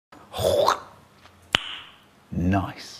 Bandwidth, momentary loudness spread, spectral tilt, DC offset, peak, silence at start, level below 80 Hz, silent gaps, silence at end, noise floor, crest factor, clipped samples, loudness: 15.5 kHz; 14 LU; -4.5 dB/octave; under 0.1%; 0 dBFS; 0.3 s; -48 dBFS; none; 0 s; -53 dBFS; 26 dB; under 0.1%; -25 LUFS